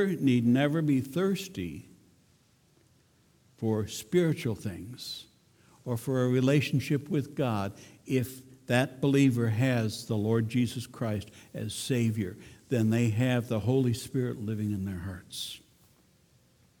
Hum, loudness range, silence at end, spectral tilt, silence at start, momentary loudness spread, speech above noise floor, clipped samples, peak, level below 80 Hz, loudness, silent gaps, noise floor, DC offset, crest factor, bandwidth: none; 5 LU; 1.2 s; -6.5 dB/octave; 0 s; 14 LU; 36 dB; under 0.1%; -10 dBFS; -64 dBFS; -29 LUFS; none; -65 dBFS; under 0.1%; 18 dB; 18.5 kHz